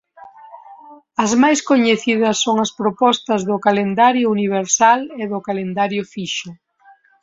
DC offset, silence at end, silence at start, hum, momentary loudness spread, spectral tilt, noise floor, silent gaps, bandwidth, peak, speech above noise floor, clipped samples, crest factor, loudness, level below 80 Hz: under 0.1%; 0.7 s; 0.2 s; none; 10 LU; -3.5 dB/octave; -51 dBFS; none; 8 kHz; -2 dBFS; 34 dB; under 0.1%; 16 dB; -17 LUFS; -62 dBFS